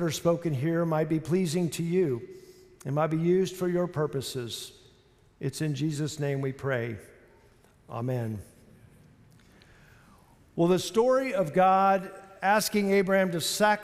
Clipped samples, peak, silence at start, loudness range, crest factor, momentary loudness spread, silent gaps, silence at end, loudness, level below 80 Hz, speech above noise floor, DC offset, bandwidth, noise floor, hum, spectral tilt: under 0.1%; -12 dBFS; 0 s; 12 LU; 18 dB; 13 LU; none; 0 s; -27 LUFS; -64 dBFS; 34 dB; under 0.1%; 15.5 kHz; -60 dBFS; none; -5.5 dB/octave